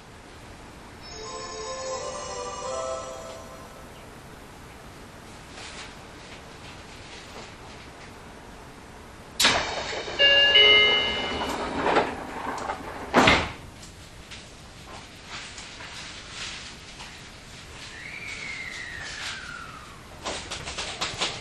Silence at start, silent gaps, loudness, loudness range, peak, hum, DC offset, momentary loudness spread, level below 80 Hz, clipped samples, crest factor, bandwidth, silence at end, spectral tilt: 0 s; none; -23 LUFS; 22 LU; -2 dBFS; none; under 0.1%; 25 LU; -50 dBFS; under 0.1%; 28 dB; 13.5 kHz; 0 s; -2 dB/octave